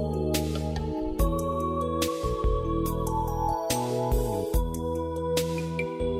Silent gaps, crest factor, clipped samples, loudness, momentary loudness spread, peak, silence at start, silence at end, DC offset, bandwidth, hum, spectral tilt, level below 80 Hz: none; 14 dB; under 0.1%; -28 LUFS; 3 LU; -12 dBFS; 0 s; 0 s; under 0.1%; 16 kHz; none; -5.5 dB/octave; -34 dBFS